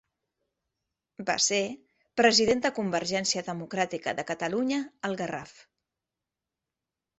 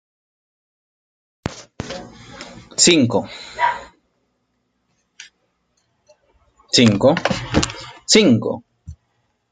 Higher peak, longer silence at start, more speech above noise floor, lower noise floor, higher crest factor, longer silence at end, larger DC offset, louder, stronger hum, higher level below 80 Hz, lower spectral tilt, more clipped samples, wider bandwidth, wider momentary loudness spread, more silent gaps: second, -6 dBFS vs 0 dBFS; second, 1.2 s vs 1.45 s; first, 61 dB vs 54 dB; first, -89 dBFS vs -69 dBFS; about the same, 24 dB vs 22 dB; first, 1.7 s vs 0.6 s; neither; second, -27 LUFS vs -16 LUFS; neither; second, -68 dBFS vs -46 dBFS; about the same, -2.5 dB/octave vs -3.5 dB/octave; neither; second, 8.4 kHz vs 9.6 kHz; second, 13 LU vs 21 LU; neither